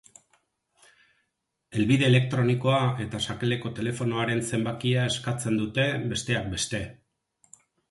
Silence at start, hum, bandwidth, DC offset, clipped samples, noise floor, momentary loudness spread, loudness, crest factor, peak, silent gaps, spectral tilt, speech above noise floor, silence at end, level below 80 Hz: 1.7 s; none; 11.5 kHz; under 0.1%; under 0.1%; -79 dBFS; 8 LU; -26 LUFS; 20 dB; -8 dBFS; none; -5.5 dB/octave; 53 dB; 0.95 s; -54 dBFS